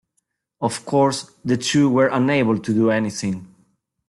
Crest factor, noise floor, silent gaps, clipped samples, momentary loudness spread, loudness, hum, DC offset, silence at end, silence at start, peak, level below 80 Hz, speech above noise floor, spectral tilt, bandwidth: 14 dB; -73 dBFS; none; under 0.1%; 10 LU; -20 LUFS; none; under 0.1%; 0.65 s; 0.6 s; -6 dBFS; -58 dBFS; 54 dB; -5.5 dB/octave; 12 kHz